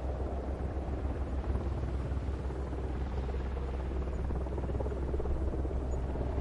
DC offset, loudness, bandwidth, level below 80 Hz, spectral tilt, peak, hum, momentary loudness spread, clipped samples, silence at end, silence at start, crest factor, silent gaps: under 0.1%; -36 LUFS; 7.4 kHz; -36 dBFS; -8.5 dB/octave; -20 dBFS; none; 2 LU; under 0.1%; 0 s; 0 s; 14 dB; none